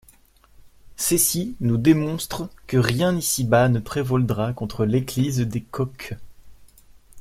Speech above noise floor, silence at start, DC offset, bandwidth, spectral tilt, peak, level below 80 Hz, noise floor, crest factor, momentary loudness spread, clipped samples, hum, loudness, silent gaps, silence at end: 32 dB; 0.65 s; under 0.1%; 16.5 kHz; -5 dB/octave; -2 dBFS; -48 dBFS; -54 dBFS; 22 dB; 11 LU; under 0.1%; none; -22 LUFS; none; 0 s